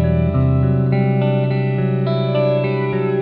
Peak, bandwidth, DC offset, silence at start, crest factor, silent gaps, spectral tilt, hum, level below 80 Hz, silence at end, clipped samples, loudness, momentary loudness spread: -4 dBFS; 4.6 kHz; under 0.1%; 0 s; 12 dB; none; -11 dB/octave; none; -34 dBFS; 0 s; under 0.1%; -17 LUFS; 2 LU